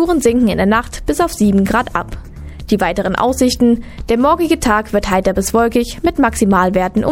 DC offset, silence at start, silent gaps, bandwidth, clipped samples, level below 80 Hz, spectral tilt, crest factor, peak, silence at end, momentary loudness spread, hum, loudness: under 0.1%; 0 s; none; 17 kHz; under 0.1%; -30 dBFS; -5.5 dB/octave; 14 dB; 0 dBFS; 0 s; 7 LU; none; -14 LUFS